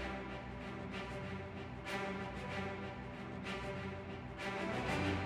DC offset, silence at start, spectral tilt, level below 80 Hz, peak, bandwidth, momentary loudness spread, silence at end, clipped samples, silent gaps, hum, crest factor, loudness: under 0.1%; 0 s; -6 dB/octave; -56 dBFS; -24 dBFS; 15 kHz; 8 LU; 0 s; under 0.1%; none; none; 18 dB; -43 LUFS